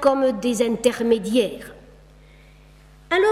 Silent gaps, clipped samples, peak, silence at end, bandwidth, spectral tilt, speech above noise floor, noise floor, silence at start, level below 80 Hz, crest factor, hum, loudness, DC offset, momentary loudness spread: none; under 0.1%; -4 dBFS; 0 s; 15.5 kHz; -4 dB/octave; 28 dB; -48 dBFS; 0 s; -50 dBFS; 18 dB; none; -21 LUFS; under 0.1%; 10 LU